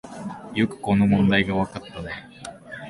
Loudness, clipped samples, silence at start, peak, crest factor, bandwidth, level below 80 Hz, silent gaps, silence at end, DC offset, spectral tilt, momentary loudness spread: -22 LUFS; under 0.1%; 0.05 s; -6 dBFS; 18 dB; 11.5 kHz; -48 dBFS; none; 0 s; under 0.1%; -7 dB/octave; 18 LU